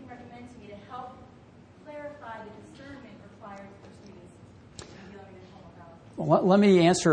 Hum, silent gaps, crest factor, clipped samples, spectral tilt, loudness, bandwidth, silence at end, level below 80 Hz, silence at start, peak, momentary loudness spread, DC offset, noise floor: none; none; 20 dB; under 0.1%; -6 dB/octave; -21 LUFS; 9.8 kHz; 0 s; -62 dBFS; 0.1 s; -8 dBFS; 29 LU; under 0.1%; -52 dBFS